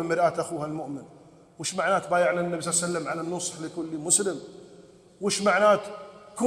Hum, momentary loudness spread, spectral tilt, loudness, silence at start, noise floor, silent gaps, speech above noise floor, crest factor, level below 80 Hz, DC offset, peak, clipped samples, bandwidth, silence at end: none; 17 LU; -3 dB/octave; -26 LUFS; 0 s; -52 dBFS; none; 26 dB; 20 dB; -70 dBFS; under 0.1%; -8 dBFS; under 0.1%; 14.5 kHz; 0 s